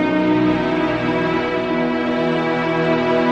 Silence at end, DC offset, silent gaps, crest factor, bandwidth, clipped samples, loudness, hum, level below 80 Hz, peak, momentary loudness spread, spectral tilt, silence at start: 0 s; under 0.1%; none; 12 dB; 8 kHz; under 0.1%; -18 LUFS; 60 Hz at -40 dBFS; -46 dBFS; -6 dBFS; 3 LU; -7 dB/octave; 0 s